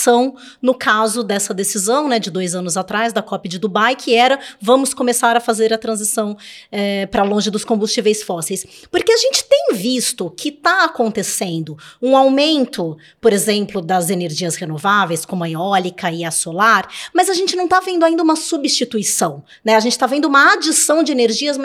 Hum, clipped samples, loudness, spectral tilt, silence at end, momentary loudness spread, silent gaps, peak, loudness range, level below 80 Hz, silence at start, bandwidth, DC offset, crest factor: none; under 0.1%; -16 LUFS; -3 dB/octave; 0 s; 9 LU; none; 0 dBFS; 3 LU; -58 dBFS; 0 s; 17 kHz; under 0.1%; 16 dB